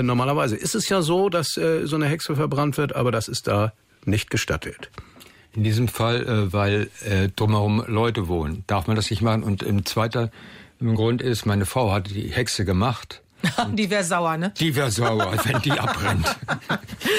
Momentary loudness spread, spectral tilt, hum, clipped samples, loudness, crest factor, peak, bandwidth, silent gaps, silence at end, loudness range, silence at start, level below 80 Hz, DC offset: 5 LU; -5 dB/octave; none; under 0.1%; -23 LUFS; 12 dB; -10 dBFS; 16 kHz; none; 0 s; 2 LU; 0 s; -48 dBFS; under 0.1%